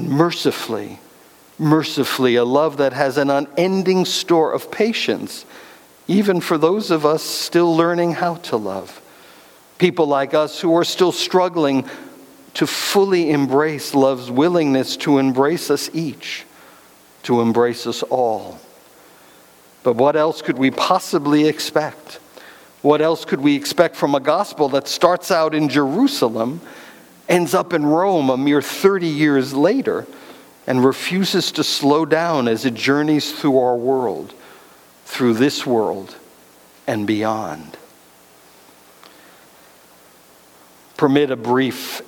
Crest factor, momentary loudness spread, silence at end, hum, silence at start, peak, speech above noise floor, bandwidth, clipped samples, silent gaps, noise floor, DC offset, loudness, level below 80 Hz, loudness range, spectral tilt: 18 dB; 12 LU; 0.05 s; none; 0 s; 0 dBFS; 31 dB; 19 kHz; under 0.1%; none; -48 dBFS; under 0.1%; -18 LUFS; -66 dBFS; 5 LU; -5 dB/octave